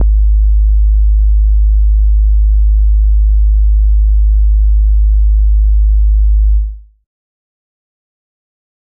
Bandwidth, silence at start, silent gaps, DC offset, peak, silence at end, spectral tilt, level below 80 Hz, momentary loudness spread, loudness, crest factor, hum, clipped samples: 0.2 kHz; 0 s; none; under 0.1%; -4 dBFS; 2.1 s; -17 dB/octave; -8 dBFS; 0 LU; -12 LUFS; 6 dB; none; under 0.1%